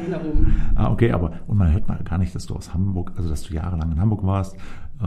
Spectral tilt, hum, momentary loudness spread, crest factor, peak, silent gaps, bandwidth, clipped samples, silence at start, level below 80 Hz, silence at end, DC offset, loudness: -8.5 dB/octave; none; 9 LU; 16 dB; -2 dBFS; none; 10 kHz; under 0.1%; 0 s; -26 dBFS; 0 s; under 0.1%; -23 LUFS